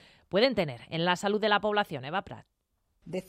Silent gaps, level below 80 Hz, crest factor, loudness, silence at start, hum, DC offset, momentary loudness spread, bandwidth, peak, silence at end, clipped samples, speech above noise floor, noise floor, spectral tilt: none; -64 dBFS; 20 dB; -29 LUFS; 0.35 s; none; under 0.1%; 12 LU; 15.5 kHz; -10 dBFS; 0.1 s; under 0.1%; 47 dB; -75 dBFS; -5 dB/octave